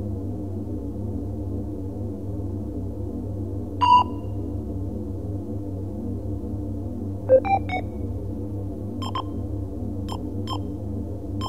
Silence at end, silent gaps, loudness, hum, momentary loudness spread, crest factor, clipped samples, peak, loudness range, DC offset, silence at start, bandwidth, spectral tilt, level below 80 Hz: 0 s; none; -27 LUFS; none; 12 LU; 20 dB; under 0.1%; -6 dBFS; 6 LU; 0.9%; 0 s; 10 kHz; -8 dB/octave; -38 dBFS